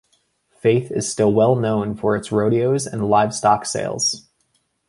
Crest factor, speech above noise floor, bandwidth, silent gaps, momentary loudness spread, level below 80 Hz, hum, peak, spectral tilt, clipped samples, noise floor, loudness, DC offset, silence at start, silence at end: 18 dB; 48 dB; 11.5 kHz; none; 5 LU; -54 dBFS; none; -2 dBFS; -5 dB/octave; under 0.1%; -67 dBFS; -19 LUFS; under 0.1%; 0.65 s; 0.7 s